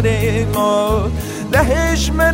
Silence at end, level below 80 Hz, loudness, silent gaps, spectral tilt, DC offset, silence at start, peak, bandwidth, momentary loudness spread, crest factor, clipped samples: 0 s; -24 dBFS; -16 LUFS; none; -5.5 dB/octave; under 0.1%; 0 s; 0 dBFS; 16.5 kHz; 4 LU; 16 dB; under 0.1%